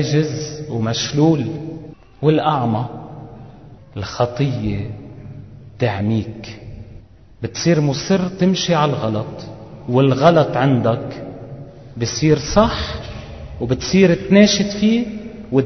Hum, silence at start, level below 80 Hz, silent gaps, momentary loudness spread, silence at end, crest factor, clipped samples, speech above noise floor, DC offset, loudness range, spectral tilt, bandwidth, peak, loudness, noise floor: none; 0 s; -40 dBFS; none; 21 LU; 0 s; 18 dB; under 0.1%; 25 dB; 0.2%; 7 LU; -6 dB/octave; 6.4 kHz; 0 dBFS; -17 LUFS; -41 dBFS